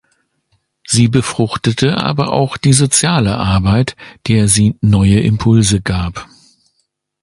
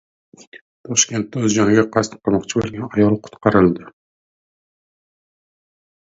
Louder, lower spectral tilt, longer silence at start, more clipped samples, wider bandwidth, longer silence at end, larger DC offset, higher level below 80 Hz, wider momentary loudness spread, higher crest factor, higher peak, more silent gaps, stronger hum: first, -13 LUFS vs -18 LUFS; about the same, -5 dB/octave vs -4.5 dB/octave; first, 0.9 s vs 0.55 s; neither; first, 11.5 kHz vs 8 kHz; second, 1 s vs 2.15 s; neither; first, -32 dBFS vs -48 dBFS; about the same, 7 LU vs 8 LU; second, 14 dB vs 20 dB; about the same, 0 dBFS vs 0 dBFS; second, none vs 0.61-0.84 s; neither